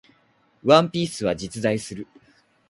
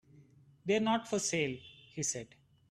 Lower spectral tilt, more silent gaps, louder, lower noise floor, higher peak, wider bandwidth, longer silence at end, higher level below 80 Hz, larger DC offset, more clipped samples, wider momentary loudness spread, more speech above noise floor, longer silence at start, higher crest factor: first, -5 dB/octave vs -3.5 dB/octave; neither; first, -22 LUFS vs -34 LUFS; about the same, -62 dBFS vs -62 dBFS; first, -2 dBFS vs -18 dBFS; second, 11.5 kHz vs 13.5 kHz; first, 0.65 s vs 0.45 s; first, -56 dBFS vs -72 dBFS; neither; neither; about the same, 19 LU vs 17 LU; first, 41 dB vs 28 dB; first, 0.65 s vs 0.15 s; about the same, 22 dB vs 18 dB